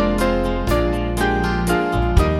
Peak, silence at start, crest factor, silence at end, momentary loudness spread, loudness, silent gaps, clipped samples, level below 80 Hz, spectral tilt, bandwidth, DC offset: 0 dBFS; 0 s; 16 dB; 0 s; 2 LU; -19 LUFS; none; under 0.1%; -24 dBFS; -6.5 dB/octave; 16.5 kHz; under 0.1%